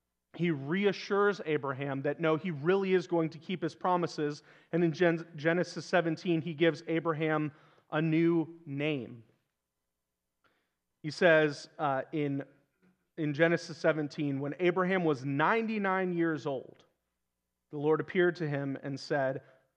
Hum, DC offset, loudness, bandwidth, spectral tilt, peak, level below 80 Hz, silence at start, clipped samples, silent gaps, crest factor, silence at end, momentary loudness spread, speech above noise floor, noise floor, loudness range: none; under 0.1%; -31 LUFS; 9 kHz; -7 dB/octave; -10 dBFS; -86 dBFS; 0.35 s; under 0.1%; none; 20 dB; 0.35 s; 9 LU; 55 dB; -86 dBFS; 3 LU